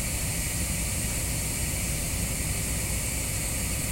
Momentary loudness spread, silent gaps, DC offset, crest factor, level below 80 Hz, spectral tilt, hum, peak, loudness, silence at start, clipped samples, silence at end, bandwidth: 0 LU; none; under 0.1%; 14 dB; -36 dBFS; -3 dB/octave; none; -16 dBFS; -28 LUFS; 0 s; under 0.1%; 0 s; 16.5 kHz